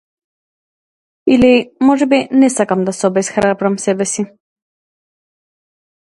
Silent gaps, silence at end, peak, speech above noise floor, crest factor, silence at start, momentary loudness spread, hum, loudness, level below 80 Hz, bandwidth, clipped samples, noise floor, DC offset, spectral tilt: none; 1.85 s; 0 dBFS; over 77 dB; 16 dB; 1.25 s; 7 LU; none; -14 LUFS; -50 dBFS; 11.5 kHz; under 0.1%; under -90 dBFS; under 0.1%; -5 dB/octave